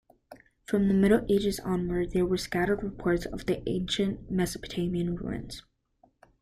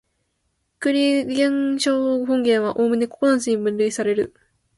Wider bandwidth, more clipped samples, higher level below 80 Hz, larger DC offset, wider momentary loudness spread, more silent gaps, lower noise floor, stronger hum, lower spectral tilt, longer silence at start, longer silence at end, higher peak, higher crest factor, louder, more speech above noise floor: first, 14.5 kHz vs 11.5 kHz; neither; first, -48 dBFS vs -62 dBFS; neither; first, 11 LU vs 4 LU; neither; second, -66 dBFS vs -71 dBFS; neither; first, -6 dB/octave vs -4 dB/octave; second, 0.3 s vs 0.8 s; first, 0.8 s vs 0.5 s; second, -10 dBFS vs -6 dBFS; about the same, 18 dB vs 14 dB; second, -29 LUFS vs -20 LUFS; second, 39 dB vs 52 dB